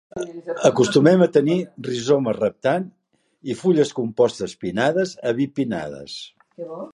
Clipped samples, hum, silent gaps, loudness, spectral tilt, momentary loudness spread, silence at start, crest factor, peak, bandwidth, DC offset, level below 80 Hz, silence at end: under 0.1%; none; none; -20 LUFS; -6 dB/octave; 18 LU; 0.15 s; 20 dB; -2 dBFS; 11.5 kHz; under 0.1%; -60 dBFS; 0.05 s